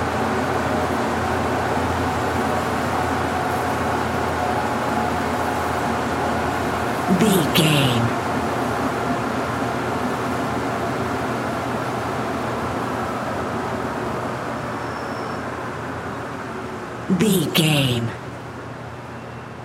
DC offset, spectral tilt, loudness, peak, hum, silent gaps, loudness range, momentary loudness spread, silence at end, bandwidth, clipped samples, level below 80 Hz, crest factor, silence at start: under 0.1%; -5 dB/octave; -22 LUFS; -4 dBFS; none; none; 6 LU; 11 LU; 0 s; 16.5 kHz; under 0.1%; -48 dBFS; 18 dB; 0 s